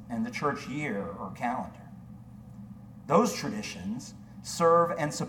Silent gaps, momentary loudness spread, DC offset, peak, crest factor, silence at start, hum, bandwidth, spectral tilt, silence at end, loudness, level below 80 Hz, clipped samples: none; 24 LU; under 0.1%; -10 dBFS; 20 dB; 0 s; none; 18 kHz; -5 dB/octave; 0 s; -29 LUFS; -60 dBFS; under 0.1%